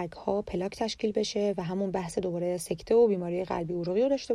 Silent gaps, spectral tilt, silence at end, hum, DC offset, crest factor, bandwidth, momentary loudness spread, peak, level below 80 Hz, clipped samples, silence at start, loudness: none; -5.5 dB/octave; 0 s; none; under 0.1%; 14 dB; 13 kHz; 8 LU; -14 dBFS; -56 dBFS; under 0.1%; 0 s; -29 LUFS